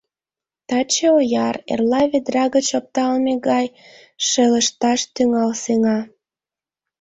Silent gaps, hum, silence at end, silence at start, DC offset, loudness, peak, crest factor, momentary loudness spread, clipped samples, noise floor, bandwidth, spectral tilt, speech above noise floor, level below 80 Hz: none; none; 0.95 s; 0.7 s; under 0.1%; -18 LUFS; -4 dBFS; 14 dB; 7 LU; under 0.1%; under -90 dBFS; 8.4 kHz; -3 dB/octave; over 72 dB; -60 dBFS